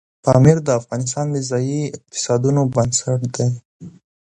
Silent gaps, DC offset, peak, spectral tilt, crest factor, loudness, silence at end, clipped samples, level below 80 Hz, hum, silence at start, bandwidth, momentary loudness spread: 3.65-3.80 s; under 0.1%; 0 dBFS; -6 dB/octave; 18 dB; -18 LUFS; 0.35 s; under 0.1%; -48 dBFS; none; 0.25 s; 10.5 kHz; 11 LU